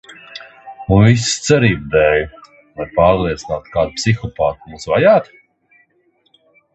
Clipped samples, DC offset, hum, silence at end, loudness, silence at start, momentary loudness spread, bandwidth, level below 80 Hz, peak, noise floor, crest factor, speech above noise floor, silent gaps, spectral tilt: under 0.1%; under 0.1%; none; 1.5 s; -15 LUFS; 0.1 s; 20 LU; 8.4 kHz; -36 dBFS; 0 dBFS; -60 dBFS; 16 dB; 46 dB; none; -5.5 dB/octave